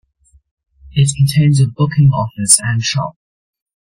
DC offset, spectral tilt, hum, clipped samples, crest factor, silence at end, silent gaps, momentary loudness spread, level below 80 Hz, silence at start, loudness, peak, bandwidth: under 0.1%; -4.5 dB/octave; none; under 0.1%; 16 dB; 0.8 s; none; 9 LU; -44 dBFS; 0.85 s; -13 LUFS; 0 dBFS; 16.5 kHz